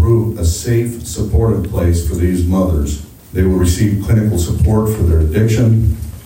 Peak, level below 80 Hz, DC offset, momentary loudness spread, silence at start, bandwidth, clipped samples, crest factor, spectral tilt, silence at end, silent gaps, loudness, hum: -2 dBFS; -24 dBFS; under 0.1%; 6 LU; 0 s; 16.5 kHz; under 0.1%; 10 dB; -7 dB/octave; 0 s; none; -15 LUFS; none